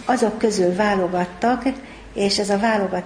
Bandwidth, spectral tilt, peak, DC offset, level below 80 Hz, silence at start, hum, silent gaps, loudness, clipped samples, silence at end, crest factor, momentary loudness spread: 10.5 kHz; -4.5 dB/octave; -4 dBFS; under 0.1%; -48 dBFS; 0 s; none; none; -20 LUFS; under 0.1%; 0 s; 16 dB; 6 LU